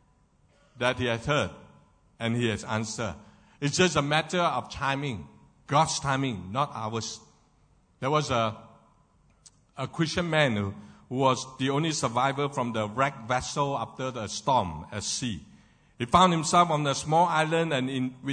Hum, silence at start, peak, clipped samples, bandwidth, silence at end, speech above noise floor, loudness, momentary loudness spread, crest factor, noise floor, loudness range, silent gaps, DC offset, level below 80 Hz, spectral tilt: none; 0.75 s; -6 dBFS; under 0.1%; 9.6 kHz; 0 s; 37 dB; -27 LUFS; 12 LU; 22 dB; -64 dBFS; 5 LU; none; under 0.1%; -56 dBFS; -4.5 dB/octave